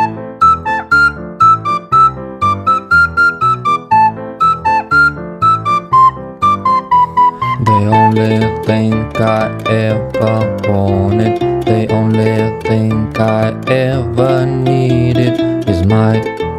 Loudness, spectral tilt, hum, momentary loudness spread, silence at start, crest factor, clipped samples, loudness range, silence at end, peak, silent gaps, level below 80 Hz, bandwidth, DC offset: -12 LUFS; -7.5 dB/octave; none; 5 LU; 0 s; 12 dB; under 0.1%; 3 LU; 0 s; 0 dBFS; none; -36 dBFS; 11 kHz; under 0.1%